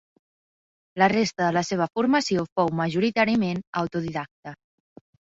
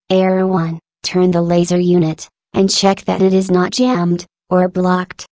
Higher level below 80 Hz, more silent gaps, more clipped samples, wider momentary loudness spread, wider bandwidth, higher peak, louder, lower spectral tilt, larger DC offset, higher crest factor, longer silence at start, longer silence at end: second, -62 dBFS vs -52 dBFS; first, 2.52-2.56 s, 3.67-3.73 s, 4.31-4.43 s vs none; neither; first, 13 LU vs 7 LU; about the same, 7.8 kHz vs 8 kHz; second, -6 dBFS vs 0 dBFS; second, -24 LUFS vs -15 LUFS; about the same, -5.5 dB/octave vs -6 dB/octave; neither; first, 20 dB vs 14 dB; first, 0.95 s vs 0.1 s; first, 0.85 s vs 0.05 s